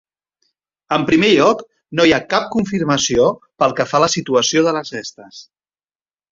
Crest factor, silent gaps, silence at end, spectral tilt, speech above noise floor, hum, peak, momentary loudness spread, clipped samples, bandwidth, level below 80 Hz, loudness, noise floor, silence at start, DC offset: 16 dB; none; 0.9 s; -4 dB/octave; over 74 dB; none; 0 dBFS; 11 LU; under 0.1%; 7.8 kHz; -50 dBFS; -16 LUFS; under -90 dBFS; 0.9 s; under 0.1%